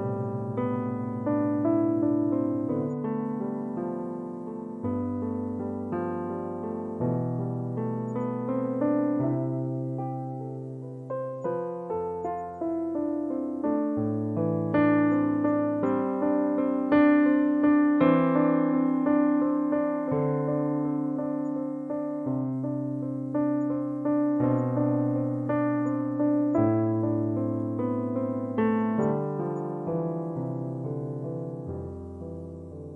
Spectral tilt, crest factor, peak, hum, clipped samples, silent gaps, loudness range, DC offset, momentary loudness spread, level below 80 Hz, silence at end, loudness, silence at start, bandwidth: -10.5 dB/octave; 16 dB; -10 dBFS; none; under 0.1%; none; 9 LU; under 0.1%; 11 LU; -66 dBFS; 0 s; -27 LUFS; 0 s; 3.7 kHz